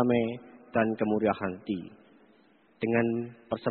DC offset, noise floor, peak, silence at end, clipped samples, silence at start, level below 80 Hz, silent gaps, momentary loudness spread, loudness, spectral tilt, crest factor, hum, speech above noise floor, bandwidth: under 0.1%; -62 dBFS; -10 dBFS; 0 s; under 0.1%; 0 s; -64 dBFS; none; 9 LU; -30 LUFS; -6 dB/octave; 20 dB; none; 34 dB; 4.4 kHz